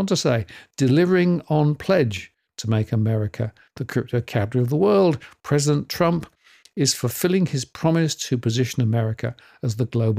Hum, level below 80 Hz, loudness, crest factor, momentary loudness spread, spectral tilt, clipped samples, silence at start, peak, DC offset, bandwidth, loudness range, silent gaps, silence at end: none; -58 dBFS; -22 LUFS; 16 dB; 12 LU; -6 dB/octave; under 0.1%; 0 s; -6 dBFS; under 0.1%; 16 kHz; 2 LU; none; 0 s